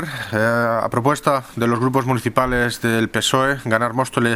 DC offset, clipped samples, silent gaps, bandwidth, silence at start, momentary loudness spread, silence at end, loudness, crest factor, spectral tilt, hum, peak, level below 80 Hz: under 0.1%; under 0.1%; none; 16.5 kHz; 0 s; 3 LU; 0 s; -19 LUFS; 18 dB; -5 dB/octave; none; 0 dBFS; -44 dBFS